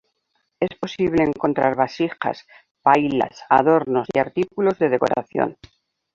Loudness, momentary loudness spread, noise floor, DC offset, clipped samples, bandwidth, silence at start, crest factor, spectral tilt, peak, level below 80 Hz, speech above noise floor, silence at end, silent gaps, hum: -20 LUFS; 9 LU; -71 dBFS; under 0.1%; under 0.1%; 7.6 kHz; 0.6 s; 20 dB; -7 dB/octave; -2 dBFS; -56 dBFS; 51 dB; 0.6 s; 2.71-2.75 s; none